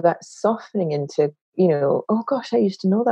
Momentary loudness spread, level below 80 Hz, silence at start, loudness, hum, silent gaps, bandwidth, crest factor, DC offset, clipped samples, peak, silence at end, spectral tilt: 5 LU; -80 dBFS; 0 s; -22 LUFS; none; 1.41-1.52 s; 8.8 kHz; 16 dB; under 0.1%; under 0.1%; -4 dBFS; 0 s; -7.5 dB/octave